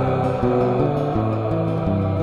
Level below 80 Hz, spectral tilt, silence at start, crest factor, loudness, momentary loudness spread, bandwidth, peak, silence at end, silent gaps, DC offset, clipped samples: -38 dBFS; -9.5 dB/octave; 0 s; 12 dB; -21 LUFS; 3 LU; 7.2 kHz; -6 dBFS; 0 s; none; 0.1%; under 0.1%